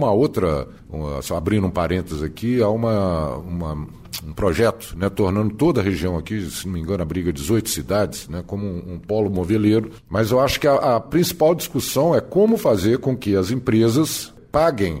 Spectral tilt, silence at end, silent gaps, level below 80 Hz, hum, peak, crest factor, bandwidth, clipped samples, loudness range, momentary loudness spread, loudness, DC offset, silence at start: -6 dB/octave; 0 s; none; -40 dBFS; none; -4 dBFS; 16 dB; 16 kHz; under 0.1%; 4 LU; 10 LU; -20 LUFS; under 0.1%; 0 s